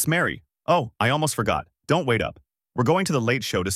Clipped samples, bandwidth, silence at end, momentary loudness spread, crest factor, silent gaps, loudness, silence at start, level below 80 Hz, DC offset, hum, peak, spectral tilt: under 0.1%; 16 kHz; 0 s; 7 LU; 16 dB; none; -23 LUFS; 0 s; -50 dBFS; under 0.1%; none; -6 dBFS; -4.5 dB/octave